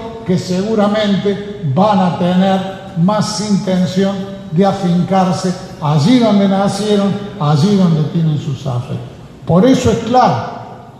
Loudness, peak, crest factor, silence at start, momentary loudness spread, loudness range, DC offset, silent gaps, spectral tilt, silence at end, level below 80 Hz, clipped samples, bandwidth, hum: -14 LUFS; 0 dBFS; 14 dB; 0 s; 10 LU; 2 LU; under 0.1%; none; -7 dB/octave; 0 s; -44 dBFS; under 0.1%; 12 kHz; none